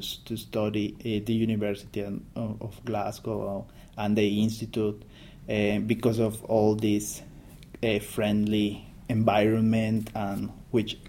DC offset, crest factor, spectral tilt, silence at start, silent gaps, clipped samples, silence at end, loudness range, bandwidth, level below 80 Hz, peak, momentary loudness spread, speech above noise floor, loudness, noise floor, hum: under 0.1%; 18 dB; -6 dB/octave; 0 s; none; under 0.1%; 0 s; 4 LU; 16.5 kHz; -52 dBFS; -10 dBFS; 11 LU; 19 dB; -28 LUFS; -47 dBFS; none